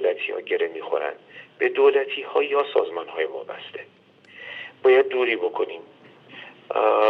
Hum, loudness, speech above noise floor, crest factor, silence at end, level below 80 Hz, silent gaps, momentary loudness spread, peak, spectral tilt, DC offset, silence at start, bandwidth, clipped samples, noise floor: none; -23 LUFS; 25 dB; 18 dB; 0 s; -86 dBFS; none; 22 LU; -6 dBFS; -5.5 dB/octave; under 0.1%; 0 s; 4.6 kHz; under 0.1%; -47 dBFS